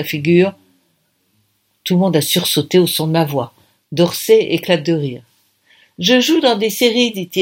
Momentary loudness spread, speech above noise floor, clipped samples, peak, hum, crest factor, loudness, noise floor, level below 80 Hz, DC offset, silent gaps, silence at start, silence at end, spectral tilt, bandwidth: 9 LU; 48 dB; under 0.1%; 0 dBFS; none; 16 dB; -15 LUFS; -63 dBFS; -62 dBFS; under 0.1%; none; 0 s; 0 s; -4.5 dB/octave; 17 kHz